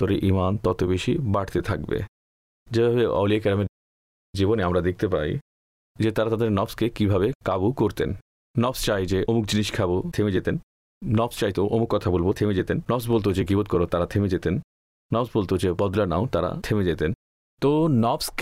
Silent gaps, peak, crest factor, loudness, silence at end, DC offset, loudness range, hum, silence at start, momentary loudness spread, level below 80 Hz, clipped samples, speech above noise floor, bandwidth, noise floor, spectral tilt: 2.08-2.66 s, 3.69-4.33 s, 5.41-5.95 s, 7.35-7.40 s, 8.22-8.54 s, 10.63-11.01 s, 14.64-15.09 s, 17.15-17.57 s; -12 dBFS; 12 dB; -24 LUFS; 0 s; under 0.1%; 2 LU; none; 0 s; 7 LU; -44 dBFS; under 0.1%; over 67 dB; 16 kHz; under -90 dBFS; -6.5 dB/octave